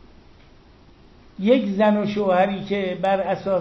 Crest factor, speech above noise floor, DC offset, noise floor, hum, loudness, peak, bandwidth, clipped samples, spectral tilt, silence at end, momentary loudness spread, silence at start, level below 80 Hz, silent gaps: 18 dB; 30 dB; under 0.1%; -50 dBFS; none; -21 LUFS; -4 dBFS; 6.2 kHz; under 0.1%; -7.5 dB/octave; 0 s; 6 LU; 1.4 s; -54 dBFS; none